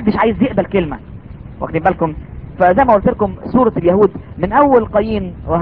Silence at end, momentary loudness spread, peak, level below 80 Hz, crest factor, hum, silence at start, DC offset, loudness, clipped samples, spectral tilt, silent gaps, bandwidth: 0 s; 18 LU; 0 dBFS; -34 dBFS; 14 dB; none; 0 s; 0.4%; -14 LUFS; under 0.1%; -10.5 dB/octave; none; 5 kHz